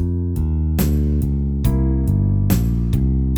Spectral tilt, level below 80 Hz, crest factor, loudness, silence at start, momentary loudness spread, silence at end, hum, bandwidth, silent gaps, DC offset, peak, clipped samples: -8 dB/octave; -22 dBFS; 14 dB; -19 LUFS; 0 s; 3 LU; 0 s; none; over 20 kHz; none; under 0.1%; -4 dBFS; under 0.1%